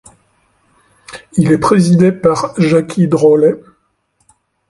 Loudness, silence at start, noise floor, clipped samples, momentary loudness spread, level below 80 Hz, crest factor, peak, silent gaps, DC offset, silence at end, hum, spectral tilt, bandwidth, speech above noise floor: -12 LUFS; 1.1 s; -62 dBFS; under 0.1%; 12 LU; -50 dBFS; 14 dB; 0 dBFS; none; under 0.1%; 1.1 s; none; -7.5 dB/octave; 11.5 kHz; 51 dB